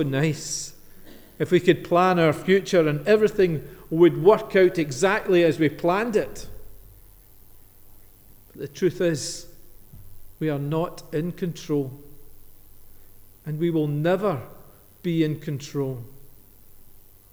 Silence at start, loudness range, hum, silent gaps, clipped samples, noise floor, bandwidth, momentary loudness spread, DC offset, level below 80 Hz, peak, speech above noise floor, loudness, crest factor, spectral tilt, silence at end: 0 s; 11 LU; none; none; under 0.1%; -49 dBFS; over 20 kHz; 14 LU; under 0.1%; -50 dBFS; -4 dBFS; 27 dB; -23 LUFS; 20 dB; -6 dB/octave; 0.45 s